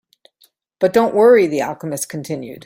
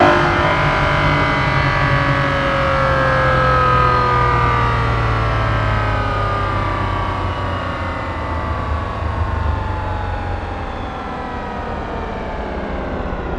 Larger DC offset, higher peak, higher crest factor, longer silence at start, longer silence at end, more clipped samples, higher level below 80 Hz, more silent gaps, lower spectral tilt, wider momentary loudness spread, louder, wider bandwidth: neither; about the same, -2 dBFS vs 0 dBFS; about the same, 16 dB vs 16 dB; first, 0.8 s vs 0 s; about the same, 0.05 s vs 0 s; neither; second, -60 dBFS vs -26 dBFS; neither; second, -5 dB/octave vs -6.5 dB/octave; first, 14 LU vs 11 LU; about the same, -16 LUFS vs -18 LUFS; first, 16.5 kHz vs 12 kHz